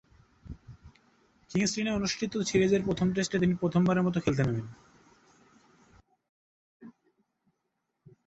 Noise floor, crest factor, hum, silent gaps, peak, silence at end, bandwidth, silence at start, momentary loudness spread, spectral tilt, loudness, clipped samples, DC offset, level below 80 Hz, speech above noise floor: -82 dBFS; 18 dB; none; 6.29-6.80 s; -12 dBFS; 1.35 s; 8.2 kHz; 0.45 s; 21 LU; -5.5 dB/octave; -28 LUFS; under 0.1%; under 0.1%; -56 dBFS; 54 dB